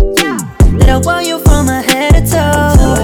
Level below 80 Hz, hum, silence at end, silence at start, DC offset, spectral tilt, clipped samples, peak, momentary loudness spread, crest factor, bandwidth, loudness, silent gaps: -12 dBFS; none; 0 s; 0 s; under 0.1%; -5 dB/octave; 2%; 0 dBFS; 3 LU; 8 dB; 19.5 kHz; -10 LUFS; none